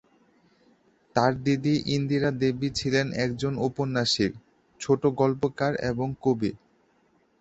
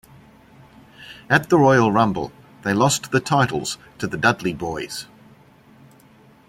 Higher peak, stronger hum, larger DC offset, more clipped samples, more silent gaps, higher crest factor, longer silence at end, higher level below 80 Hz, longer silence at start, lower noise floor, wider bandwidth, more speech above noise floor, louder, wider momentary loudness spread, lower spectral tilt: second, -6 dBFS vs -2 dBFS; neither; neither; neither; neither; about the same, 22 dB vs 20 dB; second, 0.85 s vs 1.45 s; about the same, -56 dBFS vs -54 dBFS; first, 1.15 s vs 1 s; first, -65 dBFS vs -51 dBFS; second, 8.2 kHz vs 16.5 kHz; first, 40 dB vs 32 dB; second, -26 LUFS vs -20 LUFS; second, 5 LU vs 17 LU; about the same, -5.5 dB/octave vs -5 dB/octave